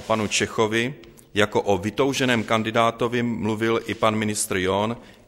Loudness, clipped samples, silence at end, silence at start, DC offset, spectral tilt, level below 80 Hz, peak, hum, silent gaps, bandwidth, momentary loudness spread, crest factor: -23 LUFS; under 0.1%; 0.15 s; 0 s; under 0.1%; -4 dB/octave; -54 dBFS; -4 dBFS; none; none; 16 kHz; 4 LU; 20 dB